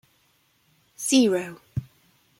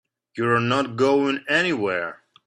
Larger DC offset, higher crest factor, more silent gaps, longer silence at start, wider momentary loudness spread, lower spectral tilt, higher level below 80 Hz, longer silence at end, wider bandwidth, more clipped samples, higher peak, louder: neither; about the same, 18 dB vs 16 dB; neither; first, 1 s vs 0.35 s; first, 16 LU vs 8 LU; second, -4 dB/octave vs -5.5 dB/octave; first, -58 dBFS vs -64 dBFS; first, 0.55 s vs 0.3 s; first, 16 kHz vs 9.8 kHz; neither; about the same, -8 dBFS vs -6 dBFS; about the same, -24 LUFS vs -22 LUFS